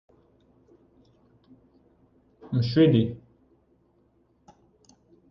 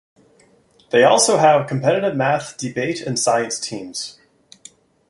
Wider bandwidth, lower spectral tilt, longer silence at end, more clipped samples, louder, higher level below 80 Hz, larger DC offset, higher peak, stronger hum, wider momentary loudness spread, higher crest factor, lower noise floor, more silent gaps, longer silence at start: second, 6.8 kHz vs 11.5 kHz; first, -9 dB/octave vs -3.5 dB/octave; first, 2.15 s vs 1 s; neither; second, -23 LUFS vs -18 LUFS; about the same, -58 dBFS vs -62 dBFS; neither; second, -10 dBFS vs -2 dBFS; neither; about the same, 13 LU vs 14 LU; about the same, 20 dB vs 18 dB; first, -65 dBFS vs -55 dBFS; neither; first, 2.45 s vs 0.95 s